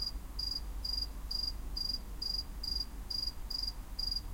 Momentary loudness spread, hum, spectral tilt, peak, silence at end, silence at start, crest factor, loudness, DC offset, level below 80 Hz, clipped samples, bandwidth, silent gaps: 2 LU; none; -3 dB/octave; -24 dBFS; 0 s; 0 s; 14 dB; -37 LUFS; under 0.1%; -42 dBFS; under 0.1%; 16.5 kHz; none